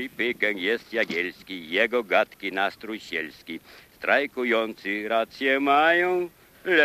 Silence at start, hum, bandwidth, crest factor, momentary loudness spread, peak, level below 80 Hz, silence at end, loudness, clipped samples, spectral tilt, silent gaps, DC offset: 0 s; none; 15.5 kHz; 20 dB; 15 LU; -6 dBFS; -66 dBFS; 0 s; -24 LUFS; under 0.1%; -4 dB/octave; none; under 0.1%